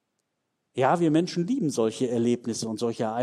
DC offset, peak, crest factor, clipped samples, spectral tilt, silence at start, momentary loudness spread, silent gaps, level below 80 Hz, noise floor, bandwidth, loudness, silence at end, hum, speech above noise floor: under 0.1%; -8 dBFS; 18 dB; under 0.1%; -6 dB/octave; 0.75 s; 7 LU; none; -72 dBFS; -79 dBFS; 13 kHz; -26 LUFS; 0 s; none; 54 dB